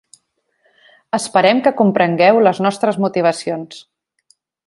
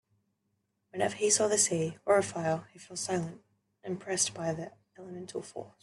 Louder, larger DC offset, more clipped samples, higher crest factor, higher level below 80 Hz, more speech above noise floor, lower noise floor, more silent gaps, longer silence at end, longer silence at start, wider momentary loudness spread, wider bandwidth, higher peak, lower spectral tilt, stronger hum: first, -15 LUFS vs -30 LUFS; neither; neither; second, 16 dB vs 22 dB; first, -64 dBFS vs -72 dBFS; about the same, 50 dB vs 48 dB; second, -64 dBFS vs -79 dBFS; neither; first, 0.85 s vs 0.15 s; first, 1.15 s vs 0.95 s; second, 12 LU vs 19 LU; about the same, 11.5 kHz vs 12.5 kHz; first, 0 dBFS vs -12 dBFS; first, -5.5 dB/octave vs -3 dB/octave; neither